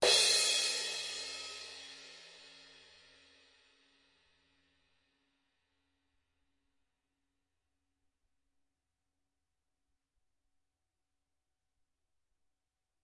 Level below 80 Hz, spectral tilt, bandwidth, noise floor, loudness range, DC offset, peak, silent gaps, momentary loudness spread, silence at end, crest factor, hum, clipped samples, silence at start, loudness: -82 dBFS; 1.5 dB/octave; 11.5 kHz; under -90 dBFS; 26 LU; under 0.1%; -14 dBFS; none; 27 LU; 10.55 s; 26 dB; none; under 0.1%; 0 s; -30 LUFS